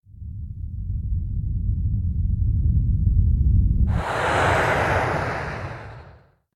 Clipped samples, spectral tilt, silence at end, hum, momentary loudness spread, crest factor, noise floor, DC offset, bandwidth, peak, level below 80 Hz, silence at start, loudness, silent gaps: under 0.1%; -7 dB/octave; 0.45 s; none; 15 LU; 14 dB; -50 dBFS; under 0.1%; 12 kHz; -8 dBFS; -26 dBFS; 0.15 s; -23 LUFS; none